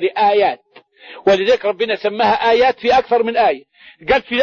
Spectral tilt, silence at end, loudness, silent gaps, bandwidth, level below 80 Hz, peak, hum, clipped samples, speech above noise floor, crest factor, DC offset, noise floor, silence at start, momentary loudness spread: -4.5 dB/octave; 0 s; -15 LUFS; none; 7 kHz; -48 dBFS; -2 dBFS; none; under 0.1%; 26 dB; 14 dB; under 0.1%; -41 dBFS; 0 s; 6 LU